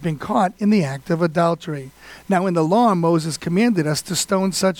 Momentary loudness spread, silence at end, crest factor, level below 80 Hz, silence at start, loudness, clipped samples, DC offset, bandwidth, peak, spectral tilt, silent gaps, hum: 7 LU; 0 s; 14 dB; -56 dBFS; 0 s; -19 LUFS; under 0.1%; under 0.1%; 18 kHz; -4 dBFS; -5.5 dB/octave; none; none